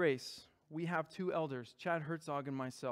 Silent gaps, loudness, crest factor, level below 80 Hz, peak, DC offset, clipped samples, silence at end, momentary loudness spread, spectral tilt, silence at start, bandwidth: none; -41 LUFS; 18 dB; -82 dBFS; -22 dBFS; under 0.1%; under 0.1%; 0 s; 8 LU; -6 dB/octave; 0 s; 15.5 kHz